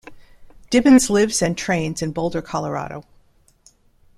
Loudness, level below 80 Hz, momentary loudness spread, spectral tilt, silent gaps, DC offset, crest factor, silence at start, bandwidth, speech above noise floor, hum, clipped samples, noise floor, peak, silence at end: -19 LUFS; -46 dBFS; 14 LU; -4.5 dB/octave; none; under 0.1%; 18 dB; 0.05 s; 14.5 kHz; 37 dB; none; under 0.1%; -56 dBFS; -2 dBFS; 1.15 s